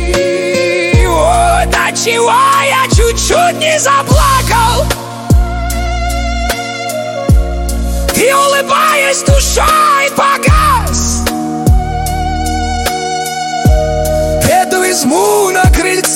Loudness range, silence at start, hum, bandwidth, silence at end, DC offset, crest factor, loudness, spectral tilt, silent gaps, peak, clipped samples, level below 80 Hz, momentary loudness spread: 4 LU; 0 s; none; 17 kHz; 0 s; under 0.1%; 10 dB; -11 LUFS; -4 dB/octave; none; 0 dBFS; under 0.1%; -16 dBFS; 8 LU